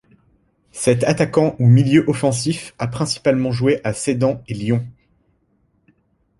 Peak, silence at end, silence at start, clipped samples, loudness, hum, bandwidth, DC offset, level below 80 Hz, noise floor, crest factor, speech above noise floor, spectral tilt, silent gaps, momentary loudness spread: -2 dBFS; 1.5 s; 0.75 s; under 0.1%; -18 LUFS; none; 11.5 kHz; under 0.1%; -50 dBFS; -63 dBFS; 18 dB; 46 dB; -6 dB/octave; none; 11 LU